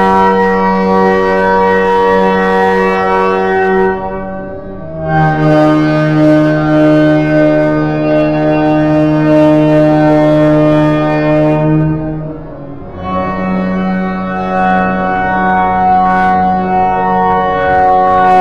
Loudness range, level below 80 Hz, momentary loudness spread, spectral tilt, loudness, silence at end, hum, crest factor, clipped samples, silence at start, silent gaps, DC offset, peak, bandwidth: 5 LU; -34 dBFS; 9 LU; -8.5 dB/octave; -10 LUFS; 0 s; none; 10 dB; under 0.1%; 0 s; none; 2%; 0 dBFS; 7.4 kHz